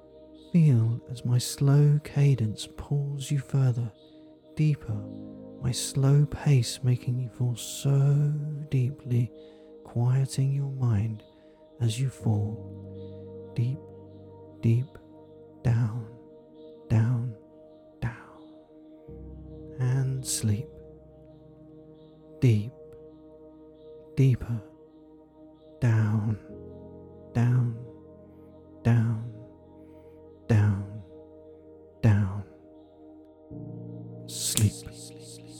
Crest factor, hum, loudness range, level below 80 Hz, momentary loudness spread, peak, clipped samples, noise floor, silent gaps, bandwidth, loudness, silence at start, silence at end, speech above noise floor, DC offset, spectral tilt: 26 dB; none; 7 LU; -56 dBFS; 22 LU; -2 dBFS; under 0.1%; -54 dBFS; none; 16.5 kHz; -27 LUFS; 0.15 s; 0 s; 28 dB; under 0.1%; -6.5 dB/octave